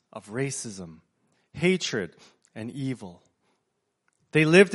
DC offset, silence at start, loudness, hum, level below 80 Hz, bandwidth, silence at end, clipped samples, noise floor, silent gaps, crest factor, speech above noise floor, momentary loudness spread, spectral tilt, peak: under 0.1%; 0.15 s; -26 LUFS; none; -66 dBFS; 11.5 kHz; 0 s; under 0.1%; -78 dBFS; none; 24 dB; 53 dB; 24 LU; -5 dB/octave; -2 dBFS